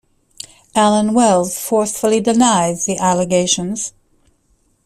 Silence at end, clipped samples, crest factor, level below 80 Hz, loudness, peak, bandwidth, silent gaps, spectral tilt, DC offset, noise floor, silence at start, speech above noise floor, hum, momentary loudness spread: 0.95 s; under 0.1%; 16 dB; -52 dBFS; -15 LUFS; -2 dBFS; 15.5 kHz; none; -4 dB/octave; under 0.1%; -60 dBFS; 0.75 s; 45 dB; none; 12 LU